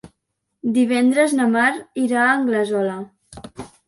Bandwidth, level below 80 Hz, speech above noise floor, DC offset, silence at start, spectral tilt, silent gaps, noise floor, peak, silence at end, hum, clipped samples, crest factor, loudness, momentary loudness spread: 11.5 kHz; -58 dBFS; 58 dB; under 0.1%; 0.05 s; -4.5 dB/octave; none; -76 dBFS; -4 dBFS; 0.2 s; none; under 0.1%; 16 dB; -18 LUFS; 20 LU